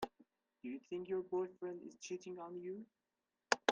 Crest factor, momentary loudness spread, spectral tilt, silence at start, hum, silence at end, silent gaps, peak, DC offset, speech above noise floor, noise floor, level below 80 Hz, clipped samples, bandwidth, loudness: 34 dB; 11 LU; -3 dB/octave; 0 s; none; 0 s; none; -10 dBFS; under 0.1%; 28 dB; -73 dBFS; -82 dBFS; under 0.1%; 10 kHz; -45 LUFS